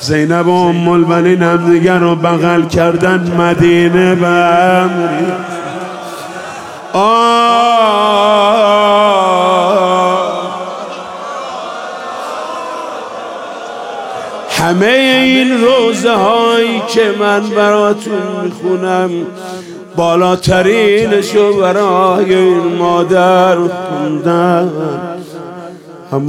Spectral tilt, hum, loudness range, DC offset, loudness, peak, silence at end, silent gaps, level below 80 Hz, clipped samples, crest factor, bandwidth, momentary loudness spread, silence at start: -5.5 dB/octave; none; 7 LU; under 0.1%; -10 LUFS; 0 dBFS; 0 s; none; -46 dBFS; under 0.1%; 12 dB; 15.5 kHz; 15 LU; 0 s